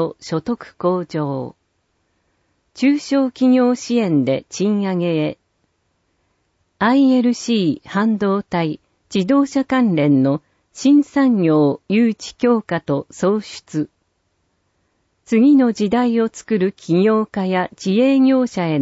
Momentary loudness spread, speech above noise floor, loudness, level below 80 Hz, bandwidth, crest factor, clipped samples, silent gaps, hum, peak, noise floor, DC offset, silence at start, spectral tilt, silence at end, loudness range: 10 LU; 51 dB; -17 LUFS; -60 dBFS; 8 kHz; 12 dB; under 0.1%; none; none; -6 dBFS; -67 dBFS; under 0.1%; 0 s; -6.5 dB/octave; 0 s; 5 LU